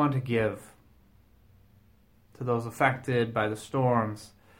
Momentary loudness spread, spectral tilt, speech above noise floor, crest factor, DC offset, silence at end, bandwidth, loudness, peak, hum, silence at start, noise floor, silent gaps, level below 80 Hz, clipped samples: 10 LU; -7 dB/octave; 34 dB; 22 dB; under 0.1%; 0.3 s; 16.5 kHz; -28 LUFS; -8 dBFS; none; 0 s; -61 dBFS; none; -60 dBFS; under 0.1%